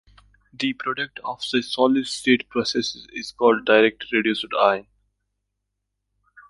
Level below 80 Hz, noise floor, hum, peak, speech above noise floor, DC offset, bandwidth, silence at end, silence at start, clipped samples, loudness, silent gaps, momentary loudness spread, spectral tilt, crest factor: -62 dBFS; -79 dBFS; 50 Hz at -55 dBFS; -2 dBFS; 58 dB; under 0.1%; 11.5 kHz; 1.7 s; 0.6 s; under 0.1%; -21 LUFS; none; 11 LU; -3.5 dB/octave; 20 dB